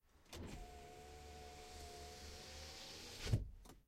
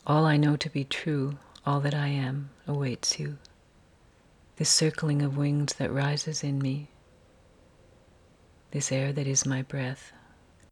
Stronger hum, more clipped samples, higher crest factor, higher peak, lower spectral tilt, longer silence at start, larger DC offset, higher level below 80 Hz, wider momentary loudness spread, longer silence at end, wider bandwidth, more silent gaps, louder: neither; neither; first, 26 dB vs 20 dB; second, -24 dBFS vs -10 dBFS; about the same, -4.5 dB/octave vs -4.5 dB/octave; about the same, 0.05 s vs 0.05 s; neither; first, -56 dBFS vs -62 dBFS; about the same, 14 LU vs 12 LU; second, 0.05 s vs 0.6 s; first, 16 kHz vs 12.5 kHz; neither; second, -51 LUFS vs -28 LUFS